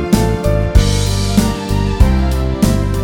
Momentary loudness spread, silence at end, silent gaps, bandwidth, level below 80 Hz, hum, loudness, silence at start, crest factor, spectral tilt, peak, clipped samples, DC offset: 4 LU; 0 s; none; 18 kHz; -16 dBFS; none; -15 LUFS; 0 s; 12 dB; -6 dB/octave; 0 dBFS; 0.4%; under 0.1%